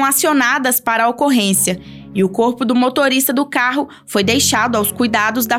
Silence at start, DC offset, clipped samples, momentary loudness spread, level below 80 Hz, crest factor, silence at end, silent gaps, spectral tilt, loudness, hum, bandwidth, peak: 0 s; under 0.1%; under 0.1%; 5 LU; -56 dBFS; 12 dB; 0 s; none; -3 dB/octave; -15 LUFS; none; 18 kHz; -2 dBFS